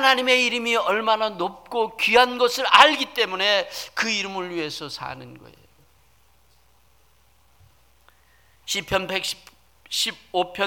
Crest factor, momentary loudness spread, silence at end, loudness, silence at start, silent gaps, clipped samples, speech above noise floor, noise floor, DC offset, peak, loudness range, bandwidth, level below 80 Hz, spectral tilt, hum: 24 dB; 14 LU; 0 s; -21 LUFS; 0 s; none; under 0.1%; 38 dB; -60 dBFS; under 0.1%; 0 dBFS; 17 LU; 19 kHz; -58 dBFS; -2 dB/octave; none